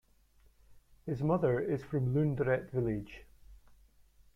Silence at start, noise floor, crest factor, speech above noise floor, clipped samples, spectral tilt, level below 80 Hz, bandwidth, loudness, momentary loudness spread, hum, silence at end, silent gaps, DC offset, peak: 0.7 s; -65 dBFS; 18 dB; 33 dB; under 0.1%; -10 dB/octave; -58 dBFS; 6.8 kHz; -33 LUFS; 15 LU; none; 0.8 s; none; under 0.1%; -18 dBFS